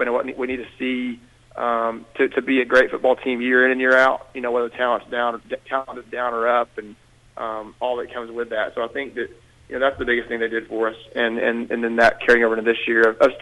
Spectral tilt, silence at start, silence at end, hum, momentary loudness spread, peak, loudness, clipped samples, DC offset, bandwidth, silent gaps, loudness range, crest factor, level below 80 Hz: -4.5 dB/octave; 0 s; 0 s; none; 14 LU; -4 dBFS; -21 LUFS; under 0.1%; under 0.1%; 11.5 kHz; none; 7 LU; 18 dB; -54 dBFS